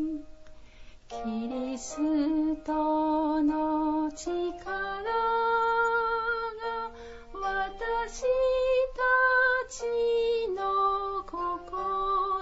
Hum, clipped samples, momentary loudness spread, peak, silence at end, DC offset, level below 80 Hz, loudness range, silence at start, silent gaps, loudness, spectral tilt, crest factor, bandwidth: none; under 0.1%; 9 LU; -14 dBFS; 0 s; under 0.1%; -50 dBFS; 3 LU; 0 s; none; -28 LUFS; -3.5 dB/octave; 14 dB; 8 kHz